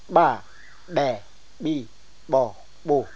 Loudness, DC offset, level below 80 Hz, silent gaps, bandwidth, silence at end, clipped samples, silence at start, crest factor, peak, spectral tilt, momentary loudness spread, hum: -25 LUFS; 1%; -58 dBFS; none; 8 kHz; 0.1 s; under 0.1%; 0.1 s; 22 dB; -4 dBFS; -6.5 dB/octave; 15 LU; none